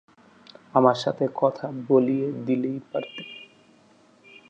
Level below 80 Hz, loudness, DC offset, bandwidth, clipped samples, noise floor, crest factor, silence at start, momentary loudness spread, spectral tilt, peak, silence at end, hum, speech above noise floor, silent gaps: -74 dBFS; -24 LUFS; under 0.1%; 8.4 kHz; under 0.1%; -57 dBFS; 22 dB; 0.75 s; 16 LU; -7 dB/octave; -4 dBFS; 1.05 s; none; 34 dB; none